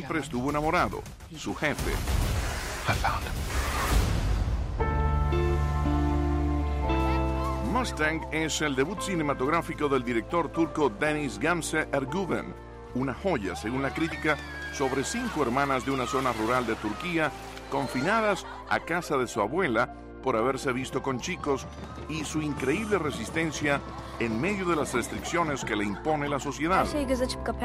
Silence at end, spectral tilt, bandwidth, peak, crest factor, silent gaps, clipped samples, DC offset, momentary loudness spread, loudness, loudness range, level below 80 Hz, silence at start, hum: 0 s; -5 dB/octave; 16 kHz; -12 dBFS; 16 dB; none; under 0.1%; under 0.1%; 5 LU; -28 LUFS; 2 LU; -36 dBFS; 0 s; none